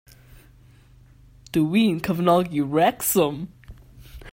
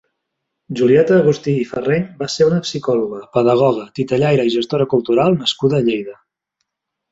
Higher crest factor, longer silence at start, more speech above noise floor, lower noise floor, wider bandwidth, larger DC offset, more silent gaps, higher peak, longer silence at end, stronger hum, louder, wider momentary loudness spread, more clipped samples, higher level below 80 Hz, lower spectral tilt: about the same, 18 dB vs 14 dB; first, 1.55 s vs 0.7 s; second, 31 dB vs 61 dB; second, -51 dBFS vs -77 dBFS; first, 16.5 kHz vs 8 kHz; neither; neither; second, -6 dBFS vs -2 dBFS; second, 0.05 s vs 1 s; neither; second, -21 LUFS vs -16 LUFS; about the same, 7 LU vs 7 LU; neither; first, -50 dBFS vs -56 dBFS; about the same, -5.5 dB/octave vs -6.5 dB/octave